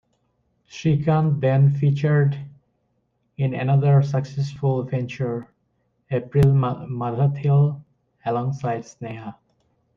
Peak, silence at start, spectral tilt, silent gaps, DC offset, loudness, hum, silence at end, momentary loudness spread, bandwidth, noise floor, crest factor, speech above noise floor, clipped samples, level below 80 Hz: -6 dBFS; 0.75 s; -9 dB/octave; none; under 0.1%; -21 LUFS; none; 0.65 s; 16 LU; 6.8 kHz; -70 dBFS; 16 dB; 50 dB; under 0.1%; -52 dBFS